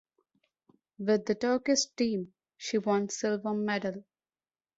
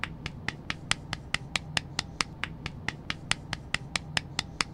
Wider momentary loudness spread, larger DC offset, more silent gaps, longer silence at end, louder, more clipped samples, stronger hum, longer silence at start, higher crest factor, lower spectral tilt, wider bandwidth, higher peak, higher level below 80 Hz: first, 10 LU vs 6 LU; neither; neither; first, 0.75 s vs 0 s; first, -30 LUFS vs -33 LUFS; neither; neither; first, 1 s vs 0 s; second, 16 dB vs 32 dB; first, -4 dB/octave vs -2.5 dB/octave; second, 8 kHz vs 16.5 kHz; second, -16 dBFS vs -2 dBFS; second, -74 dBFS vs -50 dBFS